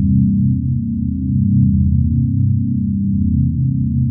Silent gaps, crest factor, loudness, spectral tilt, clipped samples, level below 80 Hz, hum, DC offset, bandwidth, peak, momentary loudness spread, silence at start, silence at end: none; 12 dB; -16 LUFS; -29.5 dB/octave; under 0.1%; -26 dBFS; none; under 0.1%; 0.4 kHz; -2 dBFS; 5 LU; 0 s; 0 s